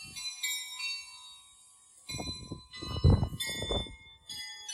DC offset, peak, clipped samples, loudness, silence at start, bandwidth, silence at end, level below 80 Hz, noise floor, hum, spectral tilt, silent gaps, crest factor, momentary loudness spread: under 0.1%; -12 dBFS; under 0.1%; -34 LUFS; 0 s; 16 kHz; 0 s; -42 dBFS; -59 dBFS; none; -4 dB/octave; none; 22 dB; 21 LU